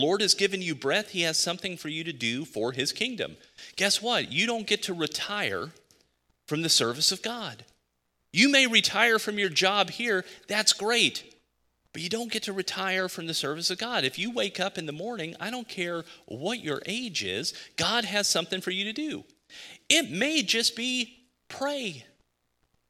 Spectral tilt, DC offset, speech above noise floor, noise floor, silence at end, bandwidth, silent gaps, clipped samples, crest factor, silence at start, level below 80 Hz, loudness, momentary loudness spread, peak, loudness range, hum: -2 dB/octave; under 0.1%; 48 dB; -76 dBFS; 0.85 s; 16.5 kHz; none; under 0.1%; 26 dB; 0 s; -70 dBFS; -26 LUFS; 13 LU; -2 dBFS; 7 LU; none